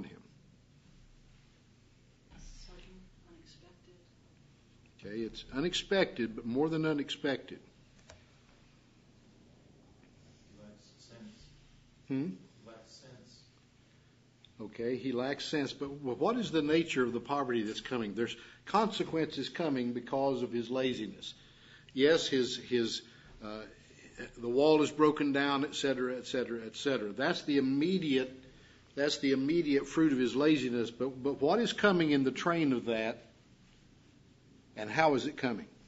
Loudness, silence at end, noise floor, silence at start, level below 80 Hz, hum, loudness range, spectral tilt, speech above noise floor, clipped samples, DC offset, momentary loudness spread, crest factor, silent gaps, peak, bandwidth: -32 LUFS; 0.2 s; -64 dBFS; 0 s; -64 dBFS; none; 15 LU; -4 dB/octave; 32 dB; under 0.1%; under 0.1%; 20 LU; 24 dB; none; -10 dBFS; 7.6 kHz